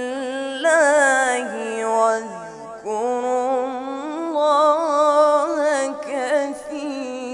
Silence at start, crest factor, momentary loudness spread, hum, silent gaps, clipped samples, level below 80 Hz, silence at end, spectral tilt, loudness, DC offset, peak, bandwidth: 0 s; 16 dB; 13 LU; none; none; under 0.1%; -66 dBFS; 0 s; -2 dB/octave; -20 LUFS; under 0.1%; -4 dBFS; 11.5 kHz